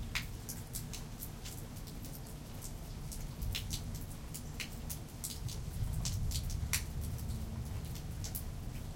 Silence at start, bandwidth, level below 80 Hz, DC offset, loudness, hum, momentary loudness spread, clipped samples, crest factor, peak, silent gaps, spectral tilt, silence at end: 0 s; 17 kHz; -44 dBFS; under 0.1%; -42 LUFS; none; 9 LU; under 0.1%; 24 dB; -16 dBFS; none; -3.5 dB/octave; 0 s